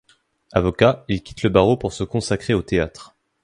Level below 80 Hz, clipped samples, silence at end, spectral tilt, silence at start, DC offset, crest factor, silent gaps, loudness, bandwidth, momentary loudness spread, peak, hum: -40 dBFS; under 0.1%; 0.4 s; -6 dB/octave; 0.55 s; under 0.1%; 20 dB; none; -20 LUFS; 11.5 kHz; 9 LU; 0 dBFS; none